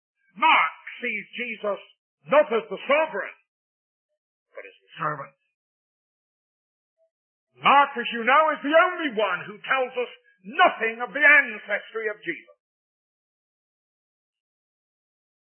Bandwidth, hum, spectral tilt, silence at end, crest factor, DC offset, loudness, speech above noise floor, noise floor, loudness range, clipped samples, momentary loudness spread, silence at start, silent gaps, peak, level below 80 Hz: 3.4 kHz; none; -7.5 dB/octave; 3.1 s; 20 dB; under 0.1%; -22 LUFS; 22 dB; -45 dBFS; 17 LU; under 0.1%; 14 LU; 0.35 s; 1.99-2.18 s, 3.48-4.09 s, 4.17-4.46 s, 5.54-6.97 s, 7.11-7.47 s; -4 dBFS; under -90 dBFS